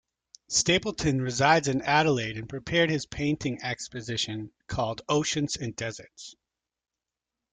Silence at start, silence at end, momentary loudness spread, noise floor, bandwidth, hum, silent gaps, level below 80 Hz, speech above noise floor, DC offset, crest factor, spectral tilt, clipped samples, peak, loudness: 0.5 s; 1.2 s; 13 LU; -89 dBFS; 9.6 kHz; none; none; -54 dBFS; 62 dB; under 0.1%; 22 dB; -4 dB/octave; under 0.1%; -6 dBFS; -27 LUFS